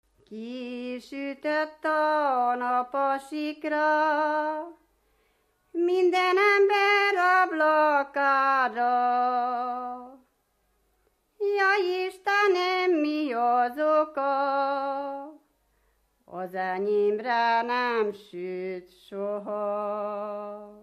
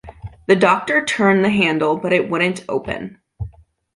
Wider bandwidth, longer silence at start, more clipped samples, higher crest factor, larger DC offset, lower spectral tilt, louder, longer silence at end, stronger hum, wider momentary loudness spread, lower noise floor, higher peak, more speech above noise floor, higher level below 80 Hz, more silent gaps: first, 14.5 kHz vs 11.5 kHz; first, 0.3 s vs 0.05 s; neither; about the same, 16 dB vs 16 dB; neither; about the same, -4.5 dB/octave vs -5.5 dB/octave; second, -25 LUFS vs -17 LUFS; second, 0.05 s vs 0.45 s; neither; second, 15 LU vs 19 LU; first, -71 dBFS vs -42 dBFS; second, -10 dBFS vs -2 dBFS; first, 46 dB vs 25 dB; second, -74 dBFS vs -44 dBFS; neither